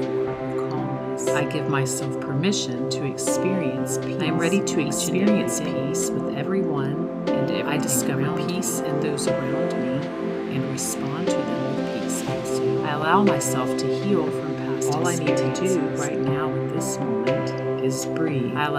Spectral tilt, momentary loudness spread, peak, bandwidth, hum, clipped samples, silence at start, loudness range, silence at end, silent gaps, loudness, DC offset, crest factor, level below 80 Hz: -5 dB/octave; 5 LU; -6 dBFS; 16 kHz; none; under 0.1%; 0 s; 2 LU; 0 s; none; -24 LUFS; under 0.1%; 18 dB; -60 dBFS